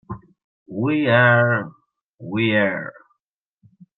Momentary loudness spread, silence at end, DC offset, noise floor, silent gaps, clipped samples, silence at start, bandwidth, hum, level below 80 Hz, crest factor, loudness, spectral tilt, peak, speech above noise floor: 23 LU; 1.05 s; under 0.1%; -80 dBFS; 0.44-0.66 s, 2.02-2.13 s; under 0.1%; 0.1 s; 4.2 kHz; none; -60 dBFS; 18 dB; -19 LUFS; -10 dB/octave; -4 dBFS; 62 dB